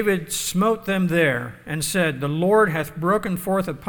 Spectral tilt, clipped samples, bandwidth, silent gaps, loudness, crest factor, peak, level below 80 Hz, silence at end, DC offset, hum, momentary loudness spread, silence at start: -5 dB/octave; under 0.1%; 19 kHz; none; -21 LUFS; 16 dB; -6 dBFS; -50 dBFS; 0 s; under 0.1%; none; 6 LU; 0 s